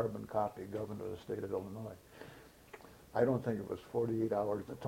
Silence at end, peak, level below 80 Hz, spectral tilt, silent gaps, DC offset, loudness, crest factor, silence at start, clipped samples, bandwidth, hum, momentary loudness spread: 0 s; -18 dBFS; -66 dBFS; -8 dB/octave; none; under 0.1%; -38 LUFS; 22 dB; 0 s; under 0.1%; 16.5 kHz; none; 21 LU